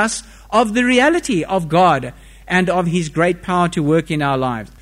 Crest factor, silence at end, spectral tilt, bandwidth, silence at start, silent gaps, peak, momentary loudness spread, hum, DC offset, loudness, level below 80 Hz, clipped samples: 14 dB; 0.15 s; -5 dB/octave; 15 kHz; 0 s; none; -2 dBFS; 6 LU; none; under 0.1%; -17 LUFS; -42 dBFS; under 0.1%